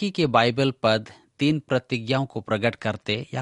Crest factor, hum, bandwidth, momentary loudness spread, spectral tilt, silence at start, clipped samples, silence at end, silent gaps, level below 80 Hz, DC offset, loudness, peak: 20 dB; none; 11 kHz; 7 LU; -6 dB/octave; 0 s; under 0.1%; 0 s; none; -60 dBFS; under 0.1%; -24 LUFS; -4 dBFS